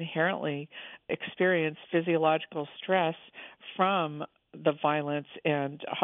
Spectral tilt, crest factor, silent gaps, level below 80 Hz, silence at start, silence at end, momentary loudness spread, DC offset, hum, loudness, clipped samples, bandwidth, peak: -9.5 dB/octave; 20 dB; none; -80 dBFS; 0 s; 0 s; 16 LU; under 0.1%; none; -30 LUFS; under 0.1%; 4 kHz; -10 dBFS